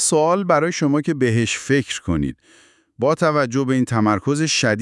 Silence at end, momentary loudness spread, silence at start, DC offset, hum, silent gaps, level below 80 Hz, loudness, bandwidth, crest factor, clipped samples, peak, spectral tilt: 0 s; 6 LU; 0 s; under 0.1%; none; none; -48 dBFS; -19 LUFS; 12 kHz; 16 dB; under 0.1%; -4 dBFS; -4.5 dB/octave